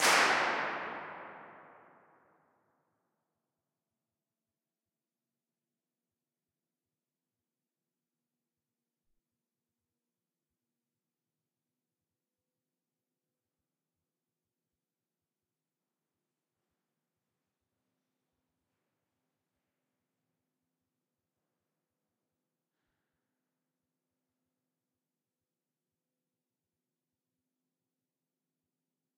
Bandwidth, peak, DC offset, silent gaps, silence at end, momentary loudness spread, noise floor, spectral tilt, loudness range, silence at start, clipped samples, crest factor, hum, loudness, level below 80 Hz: 4.6 kHz; -14 dBFS; under 0.1%; none; 27.6 s; 24 LU; under -90 dBFS; 1 dB/octave; 24 LU; 0 s; under 0.1%; 30 dB; none; -30 LUFS; -88 dBFS